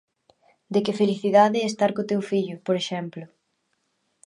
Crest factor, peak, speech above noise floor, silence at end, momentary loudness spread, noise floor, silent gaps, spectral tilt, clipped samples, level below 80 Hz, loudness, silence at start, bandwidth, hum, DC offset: 20 dB; -4 dBFS; 51 dB; 1 s; 12 LU; -73 dBFS; none; -5.5 dB/octave; under 0.1%; -74 dBFS; -23 LUFS; 0.7 s; 11 kHz; none; under 0.1%